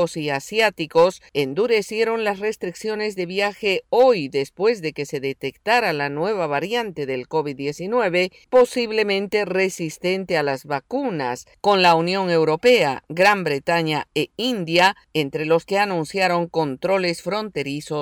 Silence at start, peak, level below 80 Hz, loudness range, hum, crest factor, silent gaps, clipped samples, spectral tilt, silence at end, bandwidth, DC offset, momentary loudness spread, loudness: 0 s; -6 dBFS; -62 dBFS; 4 LU; none; 14 dB; none; under 0.1%; -4.5 dB/octave; 0 s; 19.5 kHz; under 0.1%; 10 LU; -21 LUFS